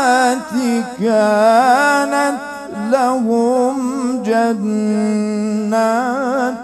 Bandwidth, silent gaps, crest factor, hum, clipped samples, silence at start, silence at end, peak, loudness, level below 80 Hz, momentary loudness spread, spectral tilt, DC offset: 13.5 kHz; none; 14 dB; none; under 0.1%; 0 s; 0 s; 0 dBFS; -15 LUFS; -60 dBFS; 7 LU; -5 dB/octave; under 0.1%